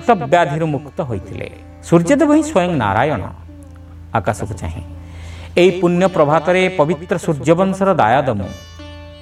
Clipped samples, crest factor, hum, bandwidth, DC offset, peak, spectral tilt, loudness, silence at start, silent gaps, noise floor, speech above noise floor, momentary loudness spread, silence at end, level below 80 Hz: under 0.1%; 16 dB; none; 13.5 kHz; under 0.1%; 0 dBFS; -6.5 dB/octave; -16 LUFS; 0 s; none; -36 dBFS; 21 dB; 20 LU; 0 s; -40 dBFS